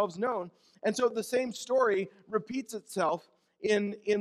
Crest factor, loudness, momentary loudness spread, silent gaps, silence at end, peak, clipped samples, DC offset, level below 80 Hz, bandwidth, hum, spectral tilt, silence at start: 16 dB; -31 LUFS; 9 LU; none; 0 s; -14 dBFS; under 0.1%; under 0.1%; -76 dBFS; 14 kHz; none; -4.5 dB/octave; 0 s